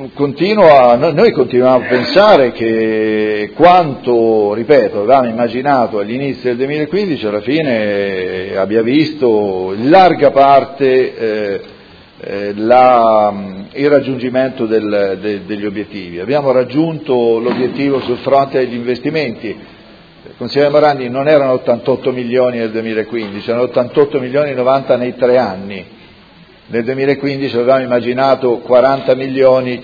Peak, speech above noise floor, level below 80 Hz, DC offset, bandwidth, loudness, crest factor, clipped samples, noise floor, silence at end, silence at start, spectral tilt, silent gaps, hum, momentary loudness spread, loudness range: 0 dBFS; 30 dB; -50 dBFS; under 0.1%; 5.4 kHz; -12 LUFS; 12 dB; 0.3%; -42 dBFS; 0 s; 0 s; -8 dB/octave; none; none; 12 LU; 5 LU